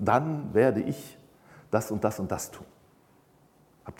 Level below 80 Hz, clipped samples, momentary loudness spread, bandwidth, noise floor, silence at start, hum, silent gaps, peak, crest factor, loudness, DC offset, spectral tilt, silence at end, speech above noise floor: -60 dBFS; under 0.1%; 21 LU; 17.5 kHz; -61 dBFS; 0 s; none; none; -8 dBFS; 22 dB; -28 LUFS; under 0.1%; -6.5 dB/octave; 0.05 s; 34 dB